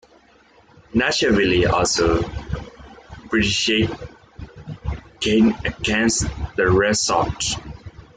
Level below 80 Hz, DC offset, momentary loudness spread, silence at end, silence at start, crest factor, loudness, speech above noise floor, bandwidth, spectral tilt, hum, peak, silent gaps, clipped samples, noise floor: -36 dBFS; under 0.1%; 19 LU; 0.15 s; 0.95 s; 16 dB; -19 LUFS; 34 dB; 9.6 kHz; -4 dB/octave; none; -4 dBFS; none; under 0.1%; -53 dBFS